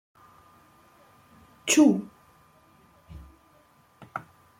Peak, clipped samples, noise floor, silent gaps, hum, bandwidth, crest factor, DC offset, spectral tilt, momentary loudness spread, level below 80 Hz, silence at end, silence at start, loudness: -8 dBFS; under 0.1%; -60 dBFS; none; none; 16 kHz; 22 dB; under 0.1%; -3.5 dB/octave; 29 LU; -60 dBFS; 0.4 s; 1.65 s; -22 LUFS